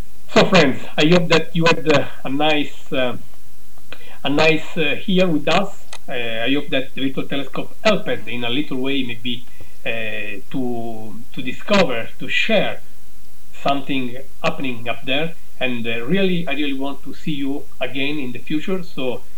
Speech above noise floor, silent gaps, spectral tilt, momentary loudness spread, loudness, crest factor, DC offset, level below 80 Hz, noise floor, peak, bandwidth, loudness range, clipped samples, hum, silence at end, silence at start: 28 dB; none; -5.5 dB/octave; 13 LU; -21 LUFS; 22 dB; 10%; -54 dBFS; -49 dBFS; 0 dBFS; over 20 kHz; 5 LU; under 0.1%; none; 0.15 s; 0.3 s